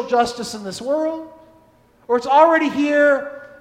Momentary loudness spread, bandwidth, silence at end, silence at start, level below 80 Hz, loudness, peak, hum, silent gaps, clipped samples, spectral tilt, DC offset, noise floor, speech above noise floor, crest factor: 15 LU; 14.5 kHz; 0.15 s; 0 s; -58 dBFS; -18 LUFS; 0 dBFS; none; none; under 0.1%; -4 dB/octave; under 0.1%; -53 dBFS; 36 dB; 18 dB